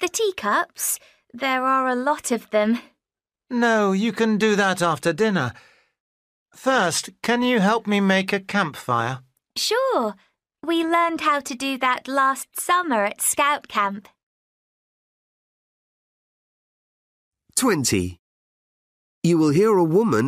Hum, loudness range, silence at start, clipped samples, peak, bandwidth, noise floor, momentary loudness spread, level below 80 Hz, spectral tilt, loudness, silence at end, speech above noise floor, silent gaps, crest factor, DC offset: none; 6 LU; 0 s; under 0.1%; -8 dBFS; 15.5 kHz; under -90 dBFS; 8 LU; -60 dBFS; -4 dB/octave; -21 LUFS; 0 s; over 69 dB; 6.00-6.46 s, 14.23-17.32 s, 18.19-19.22 s; 16 dB; under 0.1%